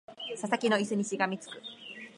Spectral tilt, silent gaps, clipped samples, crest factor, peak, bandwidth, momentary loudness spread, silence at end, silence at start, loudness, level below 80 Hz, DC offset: -4 dB/octave; none; under 0.1%; 22 dB; -12 dBFS; 11.5 kHz; 15 LU; 0.05 s; 0.1 s; -31 LUFS; -84 dBFS; under 0.1%